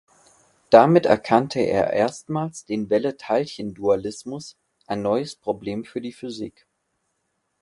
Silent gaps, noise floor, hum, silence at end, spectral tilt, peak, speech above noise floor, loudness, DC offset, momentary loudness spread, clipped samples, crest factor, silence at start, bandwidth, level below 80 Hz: none; -74 dBFS; none; 1.1 s; -6 dB/octave; 0 dBFS; 53 dB; -22 LUFS; under 0.1%; 17 LU; under 0.1%; 22 dB; 0.7 s; 11.5 kHz; -58 dBFS